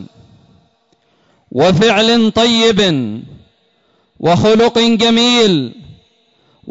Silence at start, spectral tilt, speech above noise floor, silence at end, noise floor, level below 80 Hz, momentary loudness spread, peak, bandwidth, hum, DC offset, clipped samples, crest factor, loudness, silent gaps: 0 s; -4.5 dB/octave; 47 dB; 0 s; -58 dBFS; -46 dBFS; 11 LU; -2 dBFS; 8 kHz; none; under 0.1%; under 0.1%; 12 dB; -11 LUFS; none